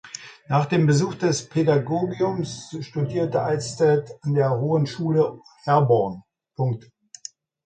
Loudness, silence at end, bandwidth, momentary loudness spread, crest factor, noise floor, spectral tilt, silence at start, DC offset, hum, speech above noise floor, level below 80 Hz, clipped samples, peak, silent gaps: -23 LUFS; 0.85 s; 9.2 kHz; 18 LU; 16 dB; -44 dBFS; -6.5 dB/octave; 0.05 s; under 0.1%; none; 23 dB; -60 dBFS; under 0.1%; -6 dBFS; none